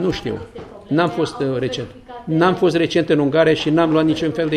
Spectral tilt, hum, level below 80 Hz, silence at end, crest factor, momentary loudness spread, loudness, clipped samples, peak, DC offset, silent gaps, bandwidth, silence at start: -6.5 dB/octave; none; -48 dBFS; 0 s; 16 dB; 14 LU; -18 LUFS; under 0.1%; -2 dBFS; under 0.1%; none; 10.5 kHz; 0 s